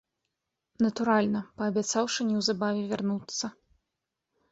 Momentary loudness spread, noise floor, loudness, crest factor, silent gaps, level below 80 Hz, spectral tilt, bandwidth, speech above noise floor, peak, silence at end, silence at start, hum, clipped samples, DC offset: 7 LU; -85 dBFS; -29 LUFS; 18 dB; none; -68 dBFS; -4 dB/octave; 8 kHz; 57 dB; -12 dBFS; 1 s; 0.8 s; none; under 0.1%; under 0.1%